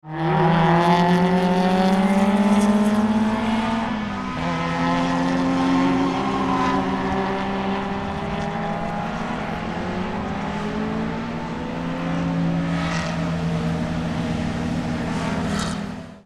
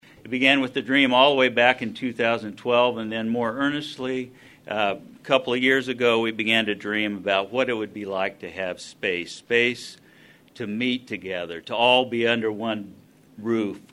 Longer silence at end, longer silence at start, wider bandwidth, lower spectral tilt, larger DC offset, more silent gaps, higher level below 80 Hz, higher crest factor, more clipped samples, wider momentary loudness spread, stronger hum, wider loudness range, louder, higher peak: about the same, 0.05 s vs 0.15 s; second, 0.05 s vs 0.25 s; about the same, 12 kHz vs 12.5 kHz; first, -6.5 dB/octave vs -4.5 dB/octave; neither; neither; first, -42 dBFS vs -68 dBFS; about the same, 18 dB vs 22 dB; neither; second, 9 LU vs 13 LU; neither; about the same, 8 LU vs 6 LU; about the same, -22 LUFS vs -23 LUFS; about the same, -4 dBFS vs -2 dBFS